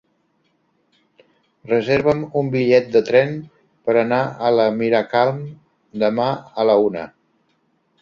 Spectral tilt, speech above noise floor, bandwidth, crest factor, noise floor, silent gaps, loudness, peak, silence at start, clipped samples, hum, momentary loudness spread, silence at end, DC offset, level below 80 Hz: -7.5 dB/octave; 48 dB; 7.2 kHz; 18 dB; -65 dBFS; none; -18 LUFS; -2 dBFS; 1.65 s; under 0.1%; none; 14 LU; 0.95 s; under 0.1%; -58 dBFS